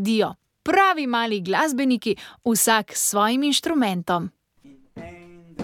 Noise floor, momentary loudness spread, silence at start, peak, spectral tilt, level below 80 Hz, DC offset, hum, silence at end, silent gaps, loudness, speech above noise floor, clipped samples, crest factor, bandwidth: -52 dBFS; 19 LU; 0 s; -6 dBFS; -3 dB/octave; -60 dBFS; under 0.1%; none; 0 s; none; -21 LUFS; 31 dB; under 0.1%; 16 dB; 17.5 kHz